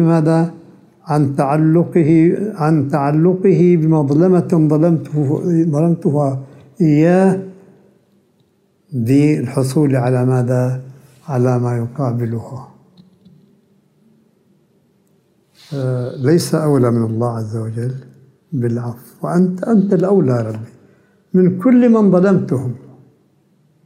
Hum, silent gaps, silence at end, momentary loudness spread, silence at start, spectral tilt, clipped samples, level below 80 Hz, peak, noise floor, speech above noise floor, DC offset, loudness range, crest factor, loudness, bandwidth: none; none; 1.1 s; 12 LU; 0 s; -8.5 dB/octave; under 0.1%; -62 dBFS; -2 dBFS; -58 dBFS; 44 dB; under 0.1%; 9 LU; 14 dB; -15 LUFS; 15 kHz